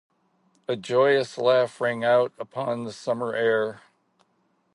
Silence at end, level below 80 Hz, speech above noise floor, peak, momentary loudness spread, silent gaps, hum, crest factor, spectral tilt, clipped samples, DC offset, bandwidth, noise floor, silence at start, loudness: 0.95 s; -76 dBFS; 45 dB; -8 dBFS; 11 LU; none; none; 16 dB; -5 dB/octave; under 0.1%; under 0.1%; 11.5 kHz; -69 dBFS; 0.7 s; -24 LUFS